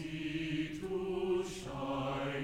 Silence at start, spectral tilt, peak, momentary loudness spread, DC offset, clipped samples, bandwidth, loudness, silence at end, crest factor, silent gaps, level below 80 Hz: 0 s; -6 dB/octave; -24 dBFS; 4 LU; under 0.1%; under 0.1%; 15.5 kHz; -38 LUFS; 0 s; 12 dB; none; -58 dBFS